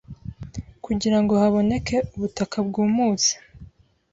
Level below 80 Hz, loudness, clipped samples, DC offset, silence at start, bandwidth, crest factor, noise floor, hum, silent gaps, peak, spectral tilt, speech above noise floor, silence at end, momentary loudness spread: -46 dBFS; -22 LUFS; under 0.1%; under 0.1%; 0.1 s; 7.8 kHz; 16 dB; -48 dBFS; none; none; -8 dBFS; -4.5 dB/octave; 27 dB; 0.5 s; 18 LU